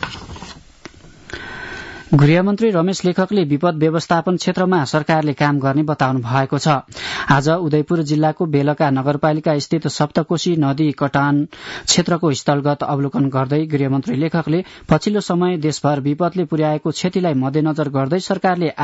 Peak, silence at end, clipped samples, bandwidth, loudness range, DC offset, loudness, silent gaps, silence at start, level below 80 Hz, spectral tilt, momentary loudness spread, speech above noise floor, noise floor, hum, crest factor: -4 dBFS; 0 s; under 0.1%; 8 kHz; 2 LU; under 0.1%; -17 LUFS; none; 0 s; -50 dBFS; -6 dB/octave; 5 LU; 24 dB; -41 dBFS; none; 14 dB